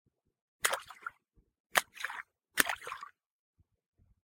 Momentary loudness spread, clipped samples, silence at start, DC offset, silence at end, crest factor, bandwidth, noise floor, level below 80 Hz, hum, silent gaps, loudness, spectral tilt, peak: 16 LU; under 0.1%; 0.65 s; under 0.1%; 1.2 s; 38 dB; 17 kHz; -71 dBFS; -72 dBFS; none; 1.60-1.70 s; -34 LUFS; 0.5 dB/octave; -2 dBFS